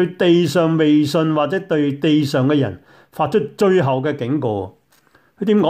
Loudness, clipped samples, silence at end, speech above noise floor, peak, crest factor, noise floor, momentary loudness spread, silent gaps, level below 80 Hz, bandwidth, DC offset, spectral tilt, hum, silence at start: -17 LUFS; under 0.1%; 0 s; 39 dB; -4 dBFS; 12 dB; -55 dBFS; 9 LU; none; -60 dBFS; 15.5 kHz; under 0.1%; -7 dB/octave; none; 0 s